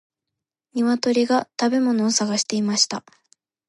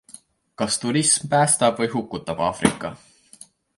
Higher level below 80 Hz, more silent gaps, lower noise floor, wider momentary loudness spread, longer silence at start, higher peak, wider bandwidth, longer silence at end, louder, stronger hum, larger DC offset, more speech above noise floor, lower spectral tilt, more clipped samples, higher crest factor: second, -72 dBFS vs -54 dBFS; neither; first, -85 dBFS vs -49 dBFS; second, 4 LU vs 12 LU; first, 0.75 s vs 0.6 s; about the same, -4 dBFS vs -2 dBFS; about the same, 11.5 kHz vs 11.5 kHz; about the same, 0.7 s vs 0.8 s; about the same, -20 LUFS vs -21 LUFS; neither; neither; first, 64 dB vs 28 dB; about the same, -3 dB/octave vs -3.5 dB/octave; neither; about the same, 18 dB vs 22 dB